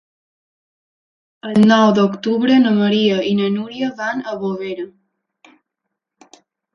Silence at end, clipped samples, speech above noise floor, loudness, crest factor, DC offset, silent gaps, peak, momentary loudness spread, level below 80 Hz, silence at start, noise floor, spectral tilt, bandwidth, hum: 1.85 s; under 0.1%; 64 dB; -16 LUFS; 18 dB; under 0.1%; none; 0 dBFS; 14 LU; -64 dBFS; 1.45 s; -79 dBFS; -6.5 dB/octave; 7 kHz; none